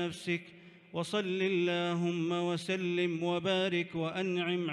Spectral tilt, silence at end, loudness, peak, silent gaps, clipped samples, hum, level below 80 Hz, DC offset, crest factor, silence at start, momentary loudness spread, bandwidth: -5.5 dB/octave; 0 s; -33 LUFS; -20 dBFS; none; under 0.1%; none; -76 dBFS; under 0.1%; 12 dB; 0 s; 6 LU; 11.5 kHz